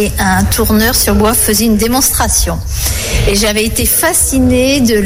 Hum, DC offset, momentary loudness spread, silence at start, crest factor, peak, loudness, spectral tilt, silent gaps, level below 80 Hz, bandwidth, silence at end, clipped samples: none; under 0.1%; 5 LU; 0 s; 10 dB; 0 dBFS; -10 LUFS; -3.5 dB/octave; none; -20 dBFS; 17 kHz; 0 s; under 0.1%